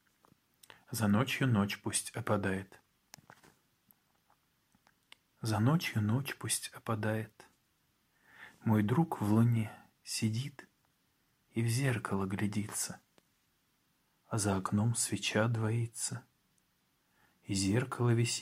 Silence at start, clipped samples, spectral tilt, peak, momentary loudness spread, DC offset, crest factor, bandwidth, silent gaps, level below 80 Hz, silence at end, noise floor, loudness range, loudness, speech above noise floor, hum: 0.9 s; under 0.1%; -5 dB/octave; -14 dBFS; 11 LU; under 0.1%; 20 dB; 16 kHz; none; -72 dBFS; 0 s; -76 dBFS; 4 LU; -33 LUFS; 43 dB; none